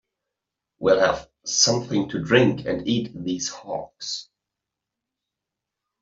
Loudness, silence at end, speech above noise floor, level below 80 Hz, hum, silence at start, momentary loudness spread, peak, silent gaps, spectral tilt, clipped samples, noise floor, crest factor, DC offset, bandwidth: -22 LUFS; 1.8 s; 63 dB; -56 dBFS; none; 0.8 s; 12 LU; -4 dBFS; none; -3.5 dB/octave; under 0.1%; -85 dBFS; 22 dB; under 0.1%; 7.8 kHz